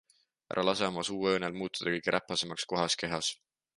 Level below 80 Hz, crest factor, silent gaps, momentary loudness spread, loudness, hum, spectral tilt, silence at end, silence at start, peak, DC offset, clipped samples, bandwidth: -66 dBFS; 22 dB; none; 5 LU; -32 LUFS; none; -3 dB/octave; 0.45 s; 0.5 s; -12 dBFS; under 0.1%; under 0.1%; 11.5 kHz